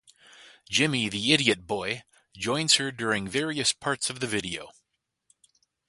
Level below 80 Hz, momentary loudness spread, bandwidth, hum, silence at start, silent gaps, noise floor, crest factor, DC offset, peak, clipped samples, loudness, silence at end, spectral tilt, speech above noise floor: -62 dBFS; 11 LU; 11.5 kHz; none; 0.4 s; none; -80 dBFS; 26 dB; under 0.1%; -4 dBFS; under 0.1%; -26 LUFS; 1.2 s; -2.5 dB/octave; 52 dB